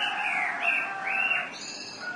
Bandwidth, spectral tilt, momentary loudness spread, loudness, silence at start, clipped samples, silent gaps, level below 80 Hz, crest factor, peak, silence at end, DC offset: 11.5 kHz; -1 dB/octave; 11 LU; -27 LUFS; 0 s; under 0.1%; none; -78 dBFS; 14 dB; -14 dBFS; 0 s; under 0.1%